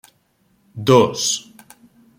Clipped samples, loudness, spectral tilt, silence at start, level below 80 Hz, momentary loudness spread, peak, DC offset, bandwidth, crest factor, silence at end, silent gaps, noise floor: under 0.1%; -17 LUFS; -4 dB/octave; 0.75 s; -60 dBFS; 13 LU; -2 dBFS; under 0.1%; 16.5 kHz; 18 dB; 0.8 s; none; -62 dBFS